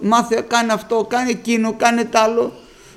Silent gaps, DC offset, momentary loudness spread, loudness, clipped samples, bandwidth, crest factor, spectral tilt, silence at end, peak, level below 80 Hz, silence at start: none; under 0.1%; 4 LU; -17 LUFS; under 0.1%; 15 kHz; 18 dB; -3.5 dB/octave; 0.35 s; 0 dBFS; -56 dBFS; 0 s